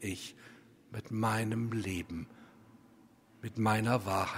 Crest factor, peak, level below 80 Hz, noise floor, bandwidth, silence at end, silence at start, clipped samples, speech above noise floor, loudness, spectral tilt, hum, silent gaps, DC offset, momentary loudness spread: 20 dB; -14 dBFS; -64 dBFS; -62 dBFS; 16 kHz; 0 s; 0 s; under 0.1%; 28 dB; -34 LUFS; -6 dB/octave; none; none; under 0.1%; 17 LU